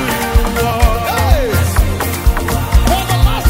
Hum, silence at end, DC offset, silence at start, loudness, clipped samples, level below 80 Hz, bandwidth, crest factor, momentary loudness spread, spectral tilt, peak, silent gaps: none; 0 s; under 0.1%; 0 s; -14 LUFS; under 0.1%; -16 dBFS; 16.5 kHz; 12 dB; 3 LU; -5 dB/octave; 0 dBFS; none